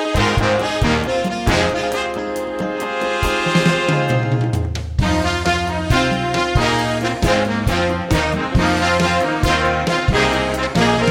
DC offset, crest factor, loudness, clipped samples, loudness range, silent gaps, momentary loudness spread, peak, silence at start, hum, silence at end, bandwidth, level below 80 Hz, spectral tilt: under 0.1%; 16 dB; -18 LUFS; under 0.1%; 2 LU; none; 5 LU; 0 dBFS; 0 s; none; 0 s; 18 kHz; -28 dBFS; -5 dB/octave